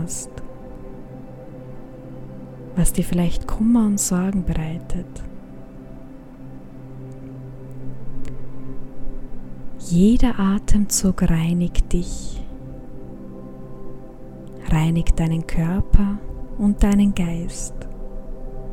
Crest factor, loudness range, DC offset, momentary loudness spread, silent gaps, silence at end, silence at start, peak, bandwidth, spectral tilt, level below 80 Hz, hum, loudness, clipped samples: 20 dB; 17 LU; under 0.1%; 21 LU; none; 0 s; 0 s; 0 dBFS; 14 kHz; -6 dB/octave; -26 dBFS; none; -21 LUFS; under 0.1%